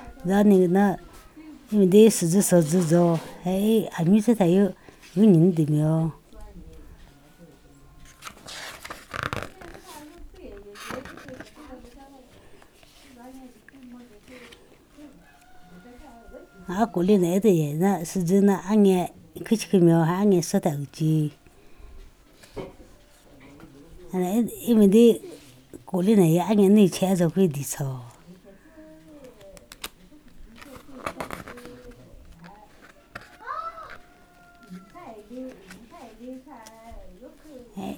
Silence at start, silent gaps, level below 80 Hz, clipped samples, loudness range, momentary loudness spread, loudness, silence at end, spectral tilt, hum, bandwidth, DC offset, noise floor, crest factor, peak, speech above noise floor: 0 s; none; -54 dBFS; under 0.1%; 21 LU; 25 LU; -21 LUFS; 0 s; -6.5 dB/octave; none; 18.5 kHz; under 0.1%; -53 dBFS; 20 dB; -6 dBFS; 33 dB